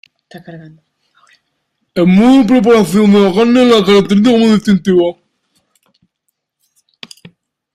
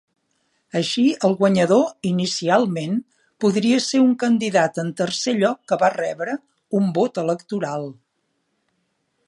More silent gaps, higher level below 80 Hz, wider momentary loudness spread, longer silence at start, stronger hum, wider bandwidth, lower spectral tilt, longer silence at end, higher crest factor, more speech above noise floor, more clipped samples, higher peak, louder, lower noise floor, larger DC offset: neither; first, -48 dBFS vs -68 dBFS; second, 6 LU vs 10 LU; second, 0.35 s vs 0.75 s; neither; first, 14 kHz vs 11.5 kHz; first, -6.5 dB/octave vs -5 dB/octave; first, 2.6 s vs 1.35 s; second, 12 dB vs 18 dB; first, 61 dB vs 52 dB; neither; first, 0 dBFS vs -4 dBFS; first, -9 LUFS vs -20 LUFS; about the same, -70 dBFS vs -72 dBFS; neither